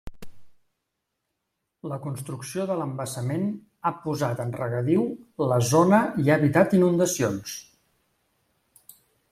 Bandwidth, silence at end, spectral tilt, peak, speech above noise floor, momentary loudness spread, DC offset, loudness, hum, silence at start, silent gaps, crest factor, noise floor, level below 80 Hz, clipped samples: 15.5 kHz; 1.7 s; -6 dB/octave; -6 dBFS; 57 dB; 14 LU; under 0.1%; -24 LUFS; none; 0.05 s; none; 20 dB; -81 dBFS; -58 dBFS; under 0.1%